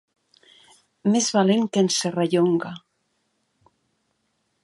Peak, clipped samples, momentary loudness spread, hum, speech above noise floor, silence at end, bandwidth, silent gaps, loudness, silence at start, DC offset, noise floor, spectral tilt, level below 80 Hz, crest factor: -6 dBFS; under 0.1%; 8 LU; none; 52 dB; 1.85 s; 11.5 kHz; none; -21 LUFS; 1.05 s; under 0.1%; -72 dBFS; -4.5 dB/octave; -74 dBFS; 18 dB